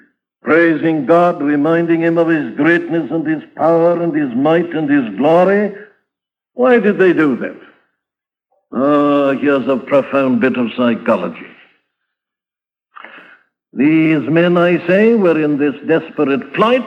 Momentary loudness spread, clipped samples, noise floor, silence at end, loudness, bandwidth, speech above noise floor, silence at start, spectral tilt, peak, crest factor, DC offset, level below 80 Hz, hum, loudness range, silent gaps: 7 LU; under 0.1%; -90 dBFS; 0 s; -14 LUFS; 6 kHz; 77 dB; 0.45 s; -8.5 dB/octave; 0 dBFS; 14 dB; under 0.1%; -64 dBFS; none; 5 LU; none